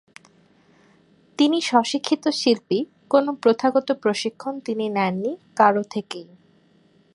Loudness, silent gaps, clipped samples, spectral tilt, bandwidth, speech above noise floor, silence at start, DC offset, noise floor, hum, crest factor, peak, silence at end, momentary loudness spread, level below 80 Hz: -22 LUFS; none; under 0.1%; -4.5 dB/octave; 11.5 kHz; 37 dB; 1.4 s; under 0.1%; -58 dBFS; none; 20 dB; -2 dBFS; 0.9 s; 11 LU; -72 dBFS